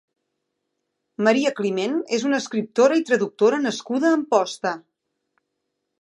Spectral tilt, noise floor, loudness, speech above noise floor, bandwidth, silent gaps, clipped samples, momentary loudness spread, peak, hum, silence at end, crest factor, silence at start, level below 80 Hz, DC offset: -4.5 dB/octave; -78 dBFS; -21 LUFS; 58 dB; 11.5 kHz; none; under 0.1%; 8 LU; -4 dBFS; none; 1.2 s; 20 dB; 1.2 s; -78 dBFS; under 0.1%